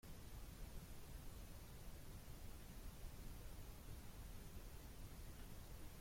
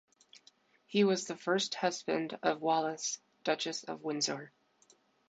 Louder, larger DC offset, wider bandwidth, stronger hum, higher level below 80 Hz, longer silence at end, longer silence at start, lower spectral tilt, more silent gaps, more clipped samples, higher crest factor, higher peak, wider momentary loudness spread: second, -59 LUFS vs -34 LUFS; neither; first, 16.5 kHz vs 9 kHz; neither; first, -58 dBFS vs -84 dBFS; second, 0 s vs 0.8 s; second, 0.05 s vs 0.9 s; about the same, -4.5 dB/octave vs -3.5 dB/octave; neither; neither; about the same, 14 dB vs 18 dB; second, -40 dBFS vs -16 dBFS; second, 1 LU vs 8 LU